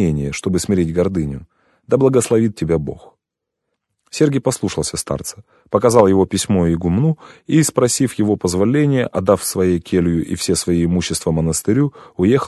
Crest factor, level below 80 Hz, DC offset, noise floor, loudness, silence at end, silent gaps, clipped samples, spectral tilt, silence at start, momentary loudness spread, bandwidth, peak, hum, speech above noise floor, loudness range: 16 dB; -36 dBFS; under 0.1%; -80 dBFS; -17 LUFS; 0 s; none; under 0.1%; -5.5 dB/octave; 0 s; 8 LU; 12.5 kHz; 0 dBFS; none; 63 dB; 4 LU